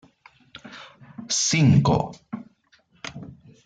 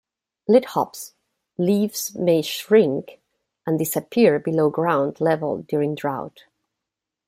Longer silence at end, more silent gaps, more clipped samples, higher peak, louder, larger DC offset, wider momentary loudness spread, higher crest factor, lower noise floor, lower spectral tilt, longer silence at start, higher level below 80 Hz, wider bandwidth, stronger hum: second, 0.3 s vs 1 s; neither; neither; second, -6 dBFS vs -2 dBFS; about the same, -20 LUFS vs -21 LUFS; neither; first, 26 LU vs 14 LU; about the same, 18 dB vs 20 dB; second, -61 dBFS vs -85 dBFS; about the same, -4.5 dB/octave vs -5.5 dB/octave; first, 0.65 s vs 0.5 s; first, -52 dBFS vs -68 dBFS; second, 9.4 kHz vs 16 kHz; neither